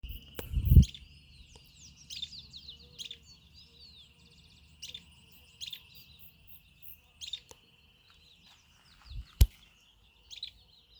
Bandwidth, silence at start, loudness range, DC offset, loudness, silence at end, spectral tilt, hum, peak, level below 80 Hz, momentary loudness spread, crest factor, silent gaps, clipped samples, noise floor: over 20 kHz; 0.05 s; 16 LU; under 0.1%; -33 LUFS; 0.55 s; -5.5 dB/octave; none; -8 dBFS; -38 dBFS; 25 LU; 28 dB; none; under 0.1%; -63 dBFS